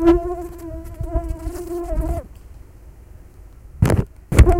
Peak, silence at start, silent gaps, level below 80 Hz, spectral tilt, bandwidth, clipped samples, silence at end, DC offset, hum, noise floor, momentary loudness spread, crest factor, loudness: 0 dBFS; 0 s; none; -24 dBFS; -7.5 dB/octave; 16 kHz; under 0.1%; 0 s; 0.2%; none; -42 dBFS; 25 LU; 20 dB; -23 LUFS